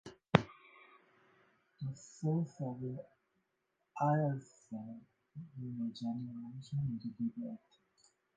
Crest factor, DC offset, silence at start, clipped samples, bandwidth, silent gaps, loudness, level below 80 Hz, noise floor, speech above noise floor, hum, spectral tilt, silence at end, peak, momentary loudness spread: 36 dB; under 0.1%; 0.05 s; under 0.1%; 8.8 kHz; none; -39 LUFS; -70 dBFS; -83 dBFS; 44 dB; none; -7.5 dB/octave; 0.8 s; -4 dBFS; 20 LU